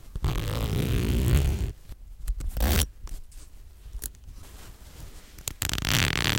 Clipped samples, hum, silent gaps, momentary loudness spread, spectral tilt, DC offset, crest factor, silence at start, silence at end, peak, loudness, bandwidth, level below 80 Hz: under 0.1%; none; none; 23 LU; -4 dB/octave; under 0.1%; 26 dB; 0.05 s; 0 s; -2 dBFS; -28 LUFS; 17 kHz; -32 dBFS